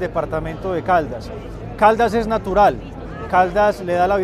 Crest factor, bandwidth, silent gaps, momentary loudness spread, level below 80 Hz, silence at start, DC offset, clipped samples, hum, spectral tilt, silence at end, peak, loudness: 18 dB; 14 kHz; none; 16 LU; -36 dBFS; 0 s; under 0.1%; under 0.1%; none; -6.5 dB/octave; 0 s; 0 dBFS; -18 LUFS